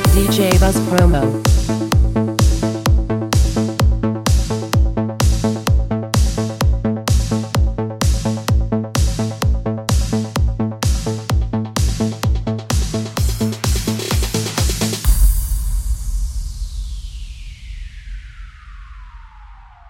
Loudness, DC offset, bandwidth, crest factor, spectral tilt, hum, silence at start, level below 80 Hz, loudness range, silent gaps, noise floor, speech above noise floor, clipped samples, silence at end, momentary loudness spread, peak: -18 LUFS; under 0.1%; 17 kHz; 16 dB; -5.5 dB/octave; none; 0 s; -20 dBFS; 7 LU; none; -39 dBFS; 26 dB; under 0.1%; 0 s; 14 LU; 0 dBFS